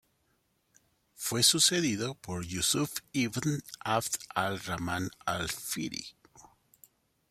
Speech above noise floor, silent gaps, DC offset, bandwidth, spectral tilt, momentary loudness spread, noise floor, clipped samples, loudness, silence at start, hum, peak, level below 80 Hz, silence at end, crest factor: 43 dB; none; under 0.1%; 16 kHz; -2.5 dB/octave; 13 LU; -74 dBFS; under 0.1%; -30 LUFS; 1.2 s; none; -8 dBFS; -62 dBFS; 0.9 s; 26 dB